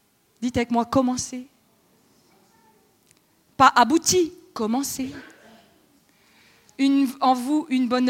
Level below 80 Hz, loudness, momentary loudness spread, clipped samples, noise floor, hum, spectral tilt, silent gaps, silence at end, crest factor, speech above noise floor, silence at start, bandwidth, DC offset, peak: -58 dBFS; -22 LUFS; 15 LU; under 0.1%; -61 dBFS; none; -3.5 dB/octave; none; 0 s; 22 dB; 40 dB; 0.4 s; 16.5 kHz; under 0.1%; -2 dBFS